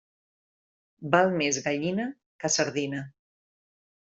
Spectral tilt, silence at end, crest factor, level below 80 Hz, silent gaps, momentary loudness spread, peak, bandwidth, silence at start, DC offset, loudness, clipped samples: -3.5 dB/octave; 0.95 s; 24 dB; -70 dBFS; 2.26-2.39 s; 14 LU; -6 dBFS; 8.2 kHz; 1 s; under 0.1%; -27 LUFS; under 0.1%